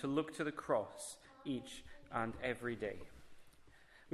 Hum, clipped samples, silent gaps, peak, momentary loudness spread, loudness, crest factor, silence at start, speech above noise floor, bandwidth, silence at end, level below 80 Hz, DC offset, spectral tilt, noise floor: none; under 0.1%; none; -22 dBFS; 14 LU; -42 LUFS; 20 dB; 0 s; 21 dB; 13.5 kHz; 0 s; -66 dBFS; under 0.1%; -5 dB/octave; -63 dBFS